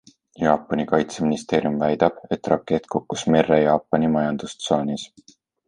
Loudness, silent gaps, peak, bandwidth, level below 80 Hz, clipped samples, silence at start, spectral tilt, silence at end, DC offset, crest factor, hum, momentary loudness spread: -22 LUFS; none; -2 dBFS; 11 kHz; -52 dBFS; under 0.1%; 0.4 s; -6 dB/octave; 0.6 s; under 0.1%; 20 dB; none; 9 LU